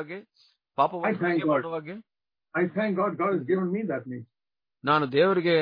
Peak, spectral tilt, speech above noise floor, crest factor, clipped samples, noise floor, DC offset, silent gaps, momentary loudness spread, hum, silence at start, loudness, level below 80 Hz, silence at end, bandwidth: -10 dBFS; -9 dB/octave; over 64 dB; 18 dB; under 0.1%; under -90 dBFS; under 0.1%; none; 17 LU; none; 0 s; -26 LUFS; -76 dBFS; 0 s; 5.2 kHz